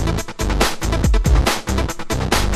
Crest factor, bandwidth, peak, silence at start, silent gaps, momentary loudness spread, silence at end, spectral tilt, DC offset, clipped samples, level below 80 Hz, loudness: 16 dB; 14.5 kHz; -2 dBFS; 0 s; none; 6 LU; 0 s; -4.5 dB/octave; under 0.1%; under 0.1%; -20 dBFS; -19 LUFS